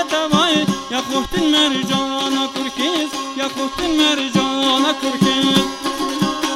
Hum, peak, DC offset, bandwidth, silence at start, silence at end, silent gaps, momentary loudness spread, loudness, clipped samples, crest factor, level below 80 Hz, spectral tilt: none; 0 dBFS; under 0.1%; 16 kHz; 0 s; 0 s; none; 7 LU; -17 LUFS; under 0.1%; 16 dB; -46 dBFS; -3.5 dB/octave